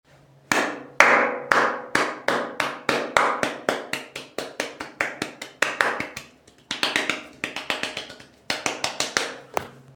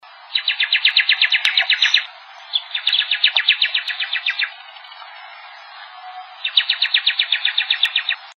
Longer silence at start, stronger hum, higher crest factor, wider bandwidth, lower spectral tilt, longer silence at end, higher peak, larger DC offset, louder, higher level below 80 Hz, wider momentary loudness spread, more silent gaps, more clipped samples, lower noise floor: first, 0.5 s vs 0.05 s; neither; first, 26 dB vs 20 dB; first, 19.5 kHz vs 11 kHz; first, -2 dB/octave vs 5.5 dB/octave; about the same, 0.05 s vs 0.05 s; about the same, 0 dBFS vs 0 dBFS; neither; second, -24 LUFS vs -16 LUFS; first, -64 dBFS vs -86 dBFS; second, 12 LU vs 23 LU; neither; neither; first, -50 dBFS vs -39 dBFS